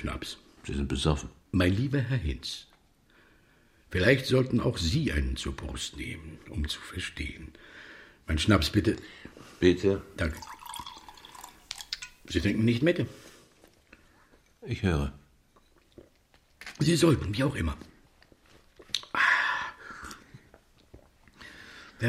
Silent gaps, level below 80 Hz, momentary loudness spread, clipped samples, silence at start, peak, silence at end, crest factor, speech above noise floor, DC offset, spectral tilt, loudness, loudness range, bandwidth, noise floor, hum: none; -42 dBFS; 23 LU; under 0.1%; 0 s; -8 dBFS; 0 s; 24 dB; 36 dB; under 0.1%; -5.5 dB/octave; -29 LUFS; 5 LU; 15.5 kHz; -64 dBFS; none